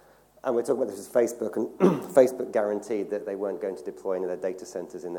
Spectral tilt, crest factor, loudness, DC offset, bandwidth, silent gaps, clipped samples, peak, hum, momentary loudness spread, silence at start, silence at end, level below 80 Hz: -6.5 dB/octave; 22 dB; -27 LUFS; under 0.1%; 18.5 kHz; none; under 0.1%; -6 dBFS; none; 13 LU; 0.45 s; 0 s; -72 dBFS